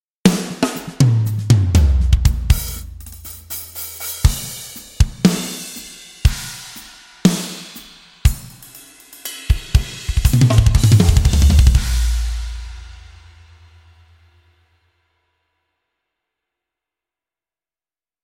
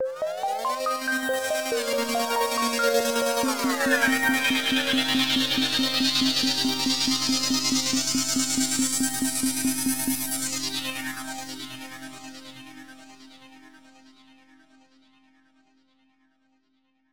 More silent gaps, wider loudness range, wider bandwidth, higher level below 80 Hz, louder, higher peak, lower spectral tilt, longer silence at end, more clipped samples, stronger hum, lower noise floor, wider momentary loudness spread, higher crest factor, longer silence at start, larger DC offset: neither; second, 8 LU vs 13 LU; second, 17 kHz vs over 20 kHz; first, -22 dBFS vs -60 dBFS; first, -17 LUFS vs -23 LUFS; first, 0 dBFS vs -8 dBFS; first, -5.5 dB/octave vs -1.5 dB/octave; first, 5.3 s vs 0 s; neither; neither; first, under -90 dBFS vs -70 dBFS; first, 21 LU vs 14 LU; about the same, 18 dB vs 18 dB; first, 0.25 s vs 0 s; second, under 0.1% vs 0.3%